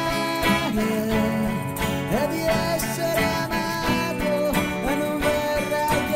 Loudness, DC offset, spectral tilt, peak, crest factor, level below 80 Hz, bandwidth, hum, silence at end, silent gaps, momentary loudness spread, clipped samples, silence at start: -23 LUFS; under 0.1%; -5 dB/octave; -8 dBFS; 14 dB; -40 dBFS; 16 kHz; none; 0 s; none; 3 LU; under 0.1%; 0 s